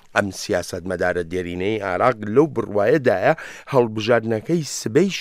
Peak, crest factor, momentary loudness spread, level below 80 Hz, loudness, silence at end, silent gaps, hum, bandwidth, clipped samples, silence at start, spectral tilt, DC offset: -2 dBFS; 18 dB; 7 LU; -54 dBFS; -21 LUFS; 0 s; none; none; 15.5 kHz; under 0.1%; 0.15 s; -5.5 dB/octave; under 0.1%